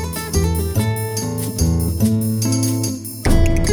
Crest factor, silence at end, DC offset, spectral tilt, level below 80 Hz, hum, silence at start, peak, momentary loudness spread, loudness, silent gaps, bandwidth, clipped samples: 14 dB; 0 s; under 0.1%; -5.5 dB/octave; -22 dBFS; none; 0 s; -2 dBFS; 5 LU; -19 LUFS; none; 18 kHz; under 0.1%